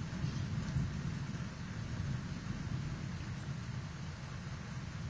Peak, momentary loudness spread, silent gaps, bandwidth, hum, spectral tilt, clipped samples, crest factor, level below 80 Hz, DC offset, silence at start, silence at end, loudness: -24 dBFS; 6 LU; none; 8 kHz; none; -6 dB/octave; under 0.1%; 16 dB; -50 dBFS; under 0.1%; 0 s; 0 s; -41 LUFS